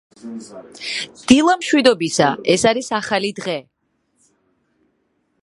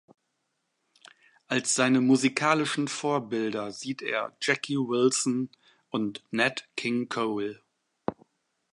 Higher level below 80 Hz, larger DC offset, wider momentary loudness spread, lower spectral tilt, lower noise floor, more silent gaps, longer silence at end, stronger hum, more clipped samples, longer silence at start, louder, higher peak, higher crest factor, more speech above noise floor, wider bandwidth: first, -54 dBFS vs -74 dBFS; neither; first, 20 LU vs 12 LU; about the same, -3.5 dB/octave vs -3.5 dB/octave; second, -67 dBFS vs -78 dBFS; neither; first, 1.8 s vs 0.6 s; neither; neither; second, 0.25 s vs 1.5 s; first, -17 LUFS vs -27 LUFS; first, 0 dBFS vs -6 dBFS; about the same, 20 dB vs 22 dB; about the same, 49 dB vs 51 dB; about the same, 11.5 kHz vs 11.5 kHz